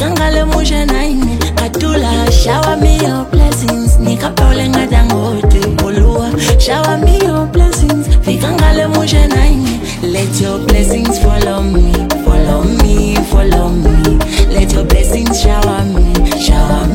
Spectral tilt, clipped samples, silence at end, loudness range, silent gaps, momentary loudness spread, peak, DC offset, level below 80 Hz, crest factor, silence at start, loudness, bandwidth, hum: -5.5 dB/octave; 0.1%; 0 s; 1 LU; none; 3 LU; 0 dBFS; under 0.1%; -12 dBFS; 10 dB; 0 s; -12 LUFS; 17 kHz; none